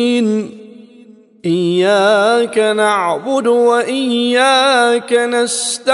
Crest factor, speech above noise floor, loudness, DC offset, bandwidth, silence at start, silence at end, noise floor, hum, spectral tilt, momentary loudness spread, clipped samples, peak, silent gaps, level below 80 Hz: 12 dB; 29 dB; -13 LUFS; under 0.1%; 11.5 kHz; 0 s; 0 s; -42 dBFS; none; -3.5 dB/octave; 6 LU; under 0.1%; -2 dBFS; none; -70 dBFS